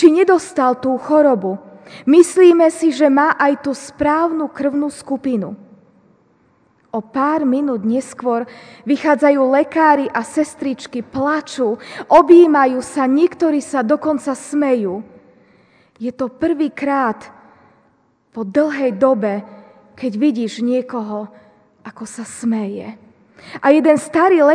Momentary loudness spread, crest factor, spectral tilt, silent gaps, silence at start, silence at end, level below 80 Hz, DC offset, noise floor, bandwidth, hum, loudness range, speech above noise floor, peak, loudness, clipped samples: 16 LU; 16 dB; -5.5 dB/octave; none; 0 s; 0 s; -58 dBFS; under 0.1%; -58 dBFS; 10 kHz; none; 8 LU; 43 dB; 0 dBFS; -16 LUFS; 0.1%